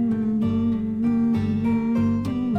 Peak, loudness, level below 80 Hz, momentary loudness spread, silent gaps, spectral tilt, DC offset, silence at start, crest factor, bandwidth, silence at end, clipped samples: -12 dBFS; -23 LUFS; -48 dBFS; 2 LU; none; -9.5 dB/octave; under 0.1%; 0 s; 8 dB; 5.6 kHz; 0 s; under 0.1%